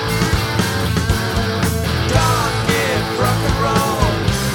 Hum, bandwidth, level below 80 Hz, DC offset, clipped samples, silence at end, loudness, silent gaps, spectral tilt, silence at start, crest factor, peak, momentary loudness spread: none; 17.5 kHz; -28 dBFS; under 0.1%; under 0.1%; 0 s; -17 LUFS; none; -4.5 dB/octave; 0 s; 16 dB; -2 dBFS; 3 LU